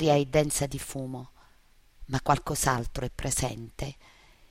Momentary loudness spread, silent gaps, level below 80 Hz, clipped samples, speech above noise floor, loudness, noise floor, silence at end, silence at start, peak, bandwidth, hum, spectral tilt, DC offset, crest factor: 14 LU; none; -44 dBFS; under 0.1%; 31 dB; -29 LUFS; -59 dBFS; 0.6 s; 0 s; -8 dBFS; 16 kHz; none; -4.5 dB/octave; under 0.1%; 22 dB